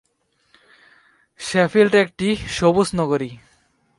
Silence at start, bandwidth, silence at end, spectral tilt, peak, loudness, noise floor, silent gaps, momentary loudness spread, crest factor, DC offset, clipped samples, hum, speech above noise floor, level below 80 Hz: 1.4 s; 11.5 kHz; 0.6 s; -5.5 dB/octave; -2 dBFS; -18 LUFS; -66 dBFS; none; 9 LU; 20 dB; under 0.1%; under 0.1%; none; 48 dB; -48 dBFS